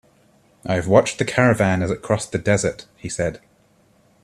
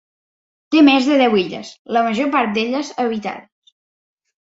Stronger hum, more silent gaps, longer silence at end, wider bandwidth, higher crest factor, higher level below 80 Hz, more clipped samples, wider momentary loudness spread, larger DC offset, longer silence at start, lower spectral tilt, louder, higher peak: neither; second, none vs 1.79-1.85 s; second, 0.85 s vs 1.1 s; first, 13 kHz vs 7.8 kHz; about the same, 20 dB vs 16 dB; first, -50 dBFS vs -62 dBFS; neither; second, 10 LU vs 14 LU; neither; about the same, 0.65 s vs 0.7 s; about the same, -5.5 dB/octave vs -5 dB/octave; second, -20 LUFS vs -17 LUFS; about the same, 0 dBFS vs -2 dBFS